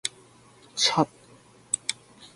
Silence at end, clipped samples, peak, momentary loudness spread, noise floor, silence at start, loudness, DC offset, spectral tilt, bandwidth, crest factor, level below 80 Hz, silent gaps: 0.1 s; under 0.1%; -6 dBFS; 14 LU; -55 dBFS; 0.05 s; -27 LUFS; under 0.1%; -2 dB/octave; 11.5 kHz; 26 dB; -68 dBFS; none